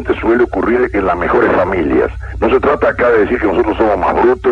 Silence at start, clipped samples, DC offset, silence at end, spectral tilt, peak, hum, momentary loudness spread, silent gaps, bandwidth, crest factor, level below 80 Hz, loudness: 0 s; under 0.1%; under 0.1%; 0 s; -8 dB/octave; 0 dBFS; none; 3 LU; none; 7 kHz; 12 dB; -30 dBFS; -13 LUFS